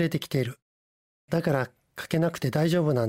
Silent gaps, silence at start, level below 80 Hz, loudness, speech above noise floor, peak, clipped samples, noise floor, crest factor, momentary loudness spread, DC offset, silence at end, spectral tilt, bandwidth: 0.62-1.28 s; 0 s; -62 dBFS; -27 LUFS; over 64 dB; -10 dBFS; under 0.1%; under -90 dBFS; 16 dB; 10 LU; under 0.1%; 0 s; -6.5 dB/octave; 16 kHz